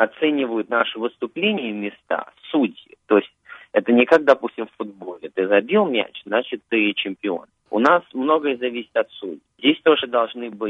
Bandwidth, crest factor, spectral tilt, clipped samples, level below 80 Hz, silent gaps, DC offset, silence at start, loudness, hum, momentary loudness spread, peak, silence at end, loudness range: 7.2 kHz; 18 dB; -6 dB/octave; under 0.1%; -70 dBFS; none; under 0.1%; 0 s; -21 LUFS; none; 13 LU; -2 dBFS; 0 s; 3 LU